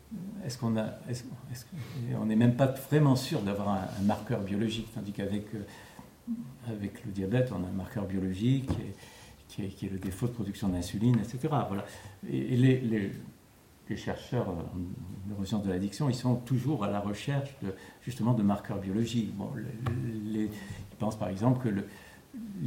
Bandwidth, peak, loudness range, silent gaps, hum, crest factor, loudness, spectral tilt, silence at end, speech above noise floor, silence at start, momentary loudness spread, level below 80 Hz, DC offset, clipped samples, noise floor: 16.5 kHz; -12 dBFS; 6 LU; none; none; 18 dB; -32 LUFS; -7 dB/octave; 0 s; 27 dB; 0.05 s; 16 LU; -60 dBFS; under 0.1%; under 0.1%; -58 dBFS